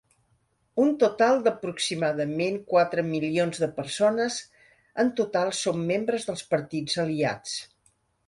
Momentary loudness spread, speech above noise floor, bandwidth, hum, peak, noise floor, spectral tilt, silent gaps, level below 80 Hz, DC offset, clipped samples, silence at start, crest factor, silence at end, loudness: 8 LU; 44 dB; 11.5 kHz; none; -8 dBFS; -69 dBFS; -4.5 dB/octave; none; -66 dBFS; under 0.1%; under 0.1%; 0.75 s; 18 dB; 0.65 s; -26 LUFS